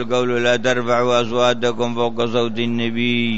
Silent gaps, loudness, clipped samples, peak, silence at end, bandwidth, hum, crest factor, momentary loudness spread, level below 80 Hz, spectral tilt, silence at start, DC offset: none; -18 LUFS; under 0.1%; -4 dBFS; 0 s; 8 kHz; none; 14 dB; 4 LU; -54 dBFS; -5 dB/octave; 0 s; 4%